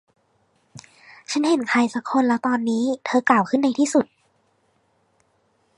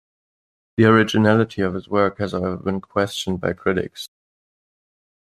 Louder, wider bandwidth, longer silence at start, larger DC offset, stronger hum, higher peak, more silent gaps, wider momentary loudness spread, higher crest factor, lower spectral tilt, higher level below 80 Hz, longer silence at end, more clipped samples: about the same, -21 LUFS vs -20 LUFS; second, 11 kHz vs 14 kHz; about the same, 0.75 s vs 0.8 s; neither; neither; about the same, -4 dBFS vs -2 dBFS; neither; second, 5 LU vs 12 LU; about the same, 20 dB vs 20 dB; second, -4 dB/octave vs -6.5 dB/octave; second, -74 dBFS vs -56 dBFS; first, 1.75 s vs 1.25 s; neither